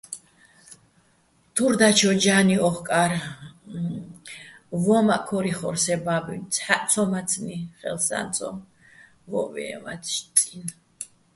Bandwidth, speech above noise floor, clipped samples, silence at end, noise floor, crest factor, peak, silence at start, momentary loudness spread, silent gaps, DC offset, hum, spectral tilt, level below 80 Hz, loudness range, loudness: 12 kHz; 39 dB; under 0.1%; 0.3 s; -62 dBFS; 24 dB; 0 dBFS; 0.1 s; 21 LU; none; under 0.1%; none; -3.5 dB/octave; -62 dBFS; 6 LU; -23 LUFS